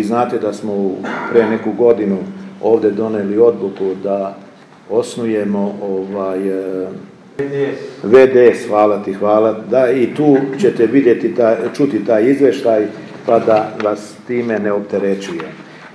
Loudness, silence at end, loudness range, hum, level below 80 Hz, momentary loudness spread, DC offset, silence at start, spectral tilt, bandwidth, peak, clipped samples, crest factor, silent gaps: -15 LUFS; 0.05 s; 7 LU; none; -64 dBFS; 11 LU; under 0.1%; 0 s; -7 dB/octave; 11 kHz; 0 dBFS; under 0.1%; 14 dB; none